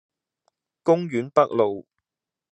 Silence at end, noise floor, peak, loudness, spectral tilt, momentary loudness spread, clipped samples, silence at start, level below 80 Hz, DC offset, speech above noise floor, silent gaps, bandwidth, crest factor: 0.7 s; -89 dBFS; -2 dBFS; -22 LUFS; -7.5 dB/octave; 8 LU; under 0.1%; 0.85 s; -78 dBFS; under 0.1%; 68 dB; none; 8.6 kHz; 22 dB